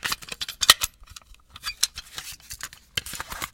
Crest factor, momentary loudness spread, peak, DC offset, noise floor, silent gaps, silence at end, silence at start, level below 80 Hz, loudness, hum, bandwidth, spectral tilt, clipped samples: 28 dB; 20 LU; 0 dBFS; under 0.1%; -48 dBFS; none; 0.05 s; 0.05 s; -50 dBFS; -24 LUFS; none; 17 kHz; 1 dB/octave; under 0.1%